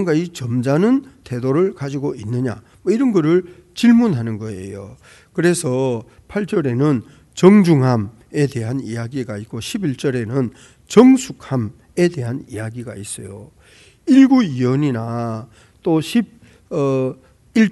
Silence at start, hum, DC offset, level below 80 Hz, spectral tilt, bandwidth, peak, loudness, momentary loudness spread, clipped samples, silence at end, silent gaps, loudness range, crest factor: 0 s; none; under 0.1%; -54 dBFS; -7 dB/octave; 12 kHz; 0 dBFS; -18 LUFS; 17 LU; under 0.1%; 0 s; none; 3 LU; 18 dB